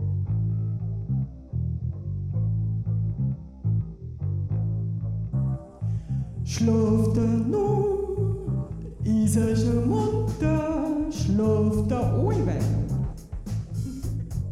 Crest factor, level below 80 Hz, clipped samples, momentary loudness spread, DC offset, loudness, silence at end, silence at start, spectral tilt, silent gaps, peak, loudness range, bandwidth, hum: 14 dB; -38 dBFS; under 0.1%; 9 LU; under 0.1%; -26 LUFS; 0 s; 0 s; -8 dB/octave; none; -12 dBFS; 5 LU; 13 kHz; none